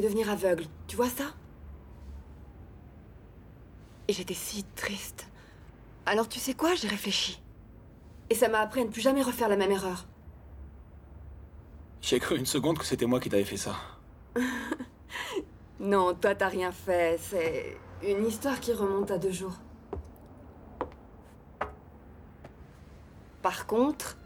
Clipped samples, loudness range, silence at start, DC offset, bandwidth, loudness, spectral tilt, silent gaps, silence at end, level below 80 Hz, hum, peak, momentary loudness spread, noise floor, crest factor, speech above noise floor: under 0.1%; 10 LU; 0 s; under 0.1%; 17 kHz; -30 LUFS; -4 dB/octave; none; 0 s; -54 dBFS; none; -12 dBFS; 23 LU; -52 dBFS; 20 dB; 22 dB